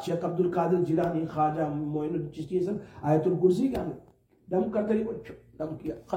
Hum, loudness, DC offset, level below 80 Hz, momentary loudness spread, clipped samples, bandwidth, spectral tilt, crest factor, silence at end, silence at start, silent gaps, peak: none; -28 LUFS; under 0.1%; -58 dBFS; 13 LU; under 0.1%; 15 kHz; -8.5 dB/octave; 18 dB; 0 s; 0 s; none; -10 dBFS